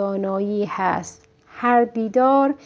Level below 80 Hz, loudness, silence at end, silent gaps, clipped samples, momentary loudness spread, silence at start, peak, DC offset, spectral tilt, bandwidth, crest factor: -62 dBFS; -20 LUFS; 0.1 s; none; under 0.1%; 8 LU; 0 s; -4 dBFS; under 0.1%; -6.5 dB/octave; 8 kHz; 16 dB